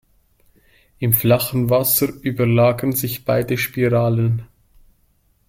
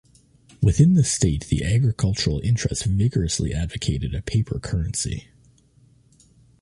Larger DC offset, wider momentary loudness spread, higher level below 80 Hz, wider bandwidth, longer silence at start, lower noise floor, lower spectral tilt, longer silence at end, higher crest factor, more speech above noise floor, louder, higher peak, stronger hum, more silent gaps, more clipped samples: neither; second, 6 LU vs 9 LU; second, -48 dBFS vs -34 dBFS; first, 16.5 kHz vs 11.5 kHz; first, 1 s vs 0.6 s; first, -60 dBFS vs -56 dBFS; about the same, -6 dB/octave vs -5.5 dB/octave; second, 1.05 s vs 1.4 s; about the same, 20 dB vs 18 dB; first, 43 dB vs 35 dB; first, -18 LUFS vs -22 LUFS; first, 0 dBFS vs -6 dBFS; neither; neither; neither